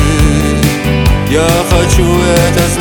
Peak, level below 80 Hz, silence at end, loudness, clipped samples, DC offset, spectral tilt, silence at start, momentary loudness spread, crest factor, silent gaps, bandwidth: 0 dBFS; -16 dBFS; 0 s; -10 LUFS; under 0.1%; under 0.1%; -5 dB/octave; 0 s; 2 LU; 8 dB; none; over 20 kHz